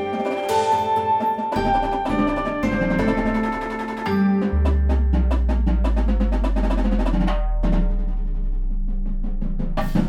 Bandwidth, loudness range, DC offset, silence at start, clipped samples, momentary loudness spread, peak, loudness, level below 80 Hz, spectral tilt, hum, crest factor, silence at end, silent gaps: 11 kHz; 3 LU; under 0.1%; 0 s; under 0.1%; 9 LU; -8 dBFS; -22 LUFS; -22 dBFS; -7.5 dB/octave; none; 12 dB; 0 s; none